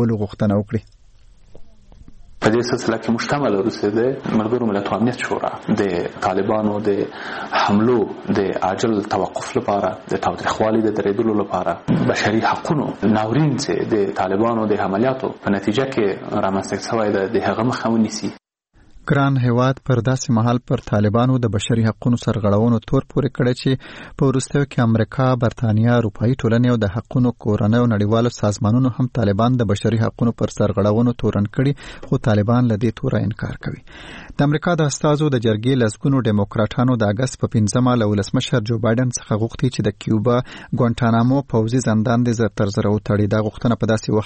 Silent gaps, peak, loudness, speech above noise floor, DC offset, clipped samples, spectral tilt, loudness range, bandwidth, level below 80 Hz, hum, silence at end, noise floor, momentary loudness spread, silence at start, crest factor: none; 0 dBFS; -19 LUFS; 33 dB; under 0.1%; under 0.1%; -6.5 dB/octave; 2 LU; 8.8 kHz; -44 dBFS; none; 0 s; -51 dBFS; 5 LU; 0 s; 18 dB